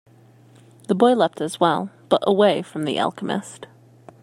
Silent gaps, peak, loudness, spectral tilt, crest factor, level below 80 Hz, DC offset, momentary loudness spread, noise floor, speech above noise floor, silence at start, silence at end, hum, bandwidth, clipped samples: none; -2 dBFS; -21 LUFS; -5.5 dB/octave; 20 dB; -70 dBFS; under 0.1%; 11 LU; -51 dBFS; 31 dB; 0.9 s; 0.6 s; none; 13.5 kHz; under 0.1%